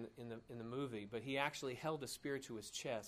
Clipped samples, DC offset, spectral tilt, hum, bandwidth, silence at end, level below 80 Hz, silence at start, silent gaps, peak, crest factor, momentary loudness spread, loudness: under 0.1%; under 0.1%; -4 dB/octave; none; 15.5 kHz; 0 s; -76 dBFS; 0 s; none; -22 dBFS; 24 dB; 10 LU; -45 LUFS